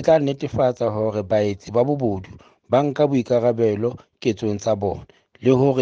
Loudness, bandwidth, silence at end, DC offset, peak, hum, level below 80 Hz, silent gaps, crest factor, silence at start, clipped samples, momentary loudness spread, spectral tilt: -21 LUFS; 7.6 kHz; 0 s; under 0.1%; -4 dBFS; none; -54 dBFS; none; 16 dB; 0 s; under 0.1%; 7 LU; -7.5 dB/octave